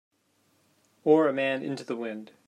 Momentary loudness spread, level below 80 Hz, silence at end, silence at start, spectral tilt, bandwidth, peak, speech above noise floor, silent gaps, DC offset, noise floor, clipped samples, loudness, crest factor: 12 LU; -80 dBFS; 0.2 s; 1.05 s; -6.5 dB/octave; 10.5 kHz; -8 dBFS; 43 dB; none; under 0.1%; -69 dBFS; under 0.1%; -27 LUFS; 20 dB